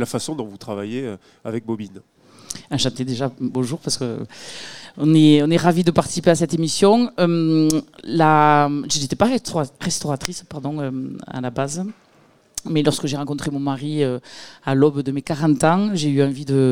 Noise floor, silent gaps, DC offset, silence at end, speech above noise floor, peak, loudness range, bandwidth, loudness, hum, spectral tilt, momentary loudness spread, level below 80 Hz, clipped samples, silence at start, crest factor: -54 dBFS; none; 0.5%; 0 s; 35 dB; 0 dBFS; 9 LU; 16 kHz; -20 LUFS; none; -5.5 dB/octave; 15 LU; -54 dBFS; under 0.1%; 0 s; 20 dB